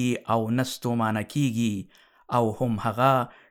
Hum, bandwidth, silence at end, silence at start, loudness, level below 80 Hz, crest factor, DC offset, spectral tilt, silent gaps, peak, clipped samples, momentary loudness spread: none; 18 kHz; 0.2 s; 0 s; -26 LUFS; -60 dBFS; 20 dB; under 0.1%; -6 dB/octave; none; -6 dBFS; under 0.1%; 6 LU